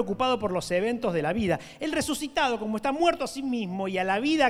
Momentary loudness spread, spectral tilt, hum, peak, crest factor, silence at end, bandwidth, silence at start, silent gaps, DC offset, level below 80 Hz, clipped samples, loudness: 5 LU; -4.5 dB/octave; none; -8 dBFS; 18 dB; 0 s; 15.5 kHz; 0 s; none; under 0.1%; -52 dBFS; under 0.1%; -27 LUFS